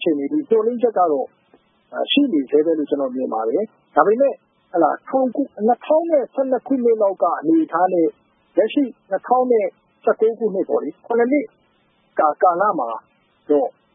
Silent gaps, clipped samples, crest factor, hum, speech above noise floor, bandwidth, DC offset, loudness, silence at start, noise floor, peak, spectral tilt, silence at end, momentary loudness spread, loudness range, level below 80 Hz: none; under 0.1%; 20 dB; none; 43 dB; 3.8 kHz; under 0.1%; -19 LUFS; 0 s; -61 dBFS; 0 dBFS; -10 dB/octave; 0.25 s; 8 LU; 2 LU; -78 dBFS